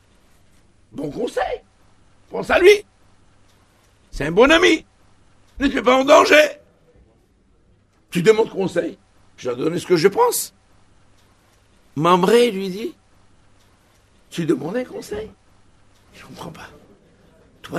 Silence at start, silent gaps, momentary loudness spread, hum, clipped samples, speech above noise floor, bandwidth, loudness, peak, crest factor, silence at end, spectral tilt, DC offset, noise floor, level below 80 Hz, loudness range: 0.95 s; none; 20 LU; none; under 0.1%; 40 dB; 13.5 kHz; -17 LUFS; 0 dBFS; 20 dB; 0 s; -4.5 dB/octave; under 0.1%; -57 dBFS; -48 dBFS; 13 LU